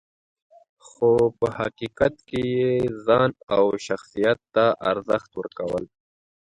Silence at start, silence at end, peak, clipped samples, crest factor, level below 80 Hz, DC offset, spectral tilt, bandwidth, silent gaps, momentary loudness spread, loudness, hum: 1 s; 0.7 s; -6 dBFS; under 0.1%; 18 dB; -54 dBFS; under 0.1%; -6.5 dB/octave; 10.5 kHz; 3.43-3.47 s; 9 LU; -23 LUFS; none